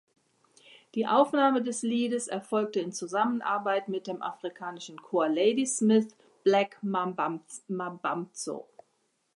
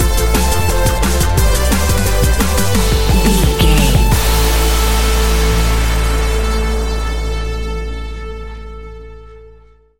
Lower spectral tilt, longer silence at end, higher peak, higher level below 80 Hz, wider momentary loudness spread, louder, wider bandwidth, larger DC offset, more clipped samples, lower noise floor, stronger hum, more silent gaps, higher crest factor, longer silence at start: about the same, -4.5 dB/octave vs -4.5 dB/octave; first, 0.75 s vs 0 s; second, -10 dBFS vs 0 dBFS; second, -84 dBFS vs -16 dBFS; about the same, 13 LU vs 14 LU; second, -29 LUFS vs -14 LUFS; second, 11.5 kHz vs 17 kHz; second, under 0.1% vs 3%; neither; first, -74 dBFS vs -44 dBFS; neither; neither; first, 20 dB vs 14 dB; first, 0.95 s vs 0 s